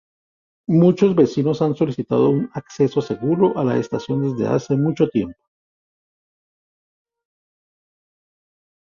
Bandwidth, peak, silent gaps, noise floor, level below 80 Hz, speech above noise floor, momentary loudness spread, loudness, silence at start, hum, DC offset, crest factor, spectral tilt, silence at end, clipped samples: 7.4 kHz; -4 dBFS; none; under -90 dBFS; -58 dBFS; over 72 dB; 7 LU; -19 LUFS; 0.7 s; none; under 0.1%; 18 dB; -8.5 dB/octave; 3.65 s; under 0.1%